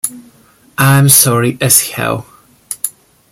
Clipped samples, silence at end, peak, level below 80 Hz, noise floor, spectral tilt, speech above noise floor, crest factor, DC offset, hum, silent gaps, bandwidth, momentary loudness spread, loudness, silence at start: 0.3%; 0.4 s; 0 dBFS; -48 dBFS; -47 dBFS; -3.5 dB/octave; 36 dB; 14 dB; under 0.1%; none; none; over 20 kHz; 16 LU; -10 LUFS; 0.05 s